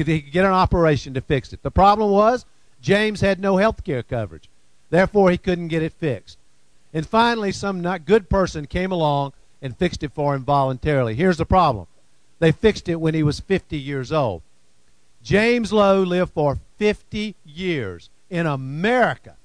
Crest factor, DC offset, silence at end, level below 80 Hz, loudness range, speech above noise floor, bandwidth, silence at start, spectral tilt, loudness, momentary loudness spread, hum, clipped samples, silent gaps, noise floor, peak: 18 dB; 0.3%; 0.15 s; -38 dBFS; 4 LU; 42 dB; 10.5 kHz; 0 s; -6.5 dB/octave; -20 LUFS; 11 LU; none; under 0.1%; none; -61 dBFS; -4 dBFS